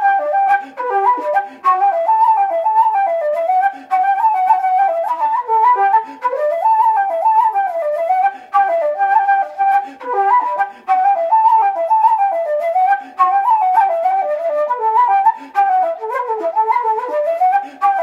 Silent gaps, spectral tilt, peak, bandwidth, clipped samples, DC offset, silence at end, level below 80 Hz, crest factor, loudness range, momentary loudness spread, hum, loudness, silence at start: none; -3 dB/octave; -2 dBFS; 12 kHz; under 0.1%; under 0.1%; 0 s; -78 dBFS; 12 dB; 1 LU; 5 LU; 60 Hz at -70 dBFS; -15 LUFS; 0 s